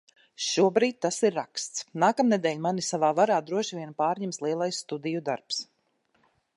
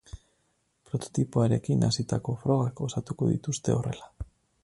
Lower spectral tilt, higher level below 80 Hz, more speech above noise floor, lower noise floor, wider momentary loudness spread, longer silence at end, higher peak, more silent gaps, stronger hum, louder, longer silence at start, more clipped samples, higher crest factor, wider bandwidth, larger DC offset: second, -4 dB/octave vs -6.5 dB/octave; second, -80 dBFS vs -50 dBFS; about the same, 45 dB vs 45 dB; about the same, -71 dBFS vs -73 dBFS; about the same, 10 LU vs 12 LU; first, 0.95 s vs 0.4 s; first, -8 dBFS vs -12 dBFS; neither; neither; about the same, -27 LUFS vs -28 LUFS; first, 0.4 s vs 0.15 s; neither; about the same, 18 dB vs 18 dB; about the same, 11.5 kHz vs 11.5 kHz; neither